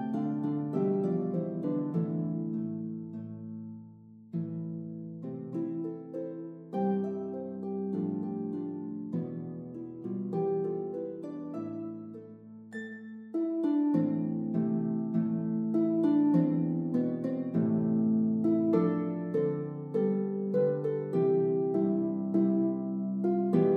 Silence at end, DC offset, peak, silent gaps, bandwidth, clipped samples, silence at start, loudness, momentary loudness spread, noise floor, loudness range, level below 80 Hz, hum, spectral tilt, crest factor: 0 s; under 0.1%; -12 dBFS; none; 4.4 kHz; under 0.1%; 0 s; -31 LUFS; 14 LU; -52 dBFS; 9 LU; -78 dBFS; none; -11.5 dB/octave; 18 dB